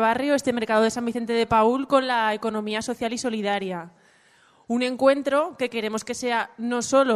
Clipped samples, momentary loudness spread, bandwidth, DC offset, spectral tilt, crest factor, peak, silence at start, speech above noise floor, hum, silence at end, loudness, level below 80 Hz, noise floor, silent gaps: under 0.1%; 8 LU; 13.5 kHz; under 0.1%; -4 dB/octave; 18 dB; -6 dBFS; 0 s; 35 dB; none; 0 s; -24 LUFS; -60 dBFS; -58 dBFS; none